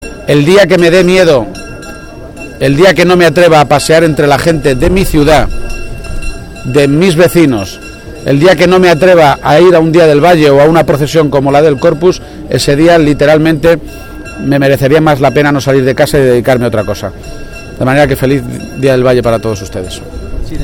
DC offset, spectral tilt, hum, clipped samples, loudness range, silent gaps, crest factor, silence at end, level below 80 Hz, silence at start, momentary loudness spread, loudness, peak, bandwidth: under 0.1%; -6 dB/octave; none; 2%; 5 LU; none; 8 dB; 0 s; -24 dBFS; 0 s; 18 LU; -7 LUFS; 0 dBFS; 18 kHz